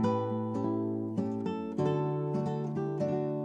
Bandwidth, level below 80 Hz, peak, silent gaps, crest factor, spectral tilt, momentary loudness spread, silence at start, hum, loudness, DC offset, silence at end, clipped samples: 8 kHz; -72 dBFS; -16 dBFS; none; 14 dB; -9 dB/octave; 4 LU; 0 s; none; -33 LUFS; under 0.1%; 0 s; under 0.1%